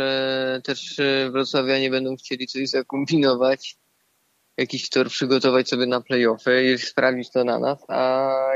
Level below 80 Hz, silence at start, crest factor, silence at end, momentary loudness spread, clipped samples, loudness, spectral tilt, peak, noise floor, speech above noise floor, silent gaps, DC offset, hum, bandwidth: -72 dBFS; 0 s; 16 dB; 0 s; 9 LU; under 0.1%; -22 LUFS; -4.5 dB/octave; -6 dBFS; -67 dBFS; 45 dB; none; under 0.1%; none; 8 kHz